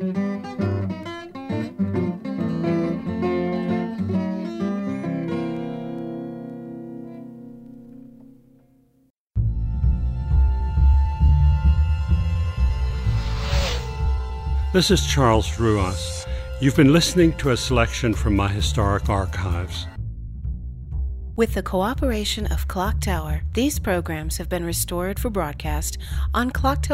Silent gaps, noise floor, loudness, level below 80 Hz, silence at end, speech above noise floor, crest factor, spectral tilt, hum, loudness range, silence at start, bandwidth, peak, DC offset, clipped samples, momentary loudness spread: 9.10-9.27 s; -58 dBFS; -23 LUFS; -26 dBFS; 0 s; 37 dB; 18 dB; -5.5 dB/octave; none; 10 LU; 0 s; 16 kHz; -4 dBFS; under 0.1%; under 0.1%; 14 LU